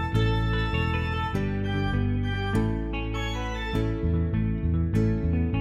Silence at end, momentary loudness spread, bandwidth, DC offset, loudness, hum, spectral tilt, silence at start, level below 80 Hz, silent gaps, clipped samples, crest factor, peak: 0 s; 5 LU; 10.5 kHz; under 0.1%; -27 LUFS; none; -7.5 dB/octave; 0 s; -32 dBFS; none; under 0.1%; 14 dB; -10 dBFS